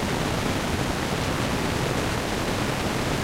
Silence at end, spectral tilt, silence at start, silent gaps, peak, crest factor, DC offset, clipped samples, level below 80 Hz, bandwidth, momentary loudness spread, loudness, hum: 0 s; -4.5 dB/octave; 0 s; none; -12 dBFS; 14 dB; under 0.1%; under 0.1%; -38 dBFS; 16 kHz; 1 LU; -26 LUFS; none